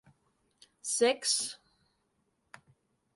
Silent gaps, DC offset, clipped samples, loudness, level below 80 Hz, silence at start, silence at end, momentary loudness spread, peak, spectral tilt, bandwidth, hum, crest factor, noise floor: none; under 0.1%; under 0.1%; -30 LUFS; -82 dBFS; 0.85 s; 1.6 s; 15 LU; -14 dBFS; 0 dB/octave; 12 kHz; none; 22 dB; -77 dBFS